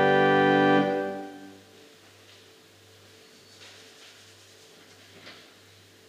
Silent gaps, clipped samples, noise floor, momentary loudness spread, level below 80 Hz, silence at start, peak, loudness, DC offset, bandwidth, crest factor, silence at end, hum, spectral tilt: none; under 0.1%; -54 dBFS; 28 LU; -80 dBFS; 0 s; -10 dBFS; -23 LUFS; under 0.1%; 15 kHz; 20 dB; 0.8 s; none; -6 dB/octave